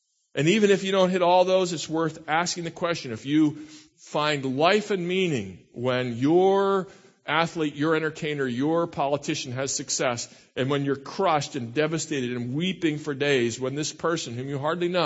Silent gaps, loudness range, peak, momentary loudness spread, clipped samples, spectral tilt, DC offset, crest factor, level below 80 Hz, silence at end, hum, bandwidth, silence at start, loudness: none; 3 LU; -6 dBFS; 9 LU; under 0.1%; -4.5 dB/octave; under 0.1%; 20 dB; -66 dBFS; 0 s; none; 8.2 kHz; 0.35 s; -25 LUFS